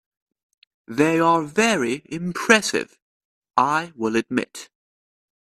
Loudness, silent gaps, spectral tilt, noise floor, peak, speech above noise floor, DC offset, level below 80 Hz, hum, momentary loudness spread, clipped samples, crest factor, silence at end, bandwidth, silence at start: -21 LUFS; 3.02-3.42 s; -4 dB/octave; under -90 dBFS; 0 dBFS; over 69 dB; under 0.1%; -64 dBFS; none; 13 LU; under 0.1%; 22 dB; 0.8 s; 14 kHz; 0.9 s